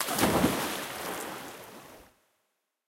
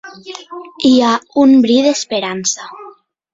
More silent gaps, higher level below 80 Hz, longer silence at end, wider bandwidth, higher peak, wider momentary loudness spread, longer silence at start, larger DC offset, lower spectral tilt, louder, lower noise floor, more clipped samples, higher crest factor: neither; about the same, -54 dBFS vs -56 dBFS; first, 0.85 s vs 0.45 s; first, 16.5 kHz vs 7.8 kHz; second, -12 dBFS vs -2 dBFS; about the same, 22 LU vs 21 LU; about the same, 0 s vs 0.05 s; neither; about the same, -3.5 dB/octave vs -3 dB/octave; second, -30 LUFS vs -13 LUFS; first, -79 dBFS vs -40 dBFS; neither; first, 20 dB vs 12 dB